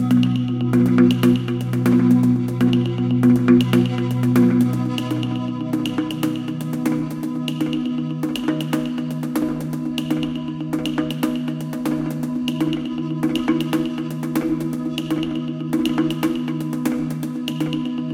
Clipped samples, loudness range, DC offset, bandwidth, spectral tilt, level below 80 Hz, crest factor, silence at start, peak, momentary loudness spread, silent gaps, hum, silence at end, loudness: under 0.1%; 7 LU; under 0.1%; 16.5 kHz; -7 dB/octave; -50 dBFS; 18 dB; 0 s; -2 dBFS; 10 LU; none; none; 0 s; -21 LUFS